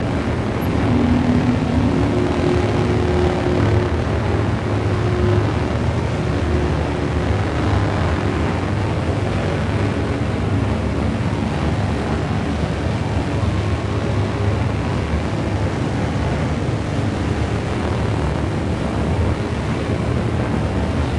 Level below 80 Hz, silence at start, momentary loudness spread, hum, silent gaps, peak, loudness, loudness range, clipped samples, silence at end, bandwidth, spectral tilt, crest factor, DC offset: -30 dBFS; 0 s; 4 LU; none; none; -4 dBFS; -20 LUFS; 3 LU; under 0.1%; 0 s; 12 kHz; -7.5 dB/octave; 16 dB; under 0.1%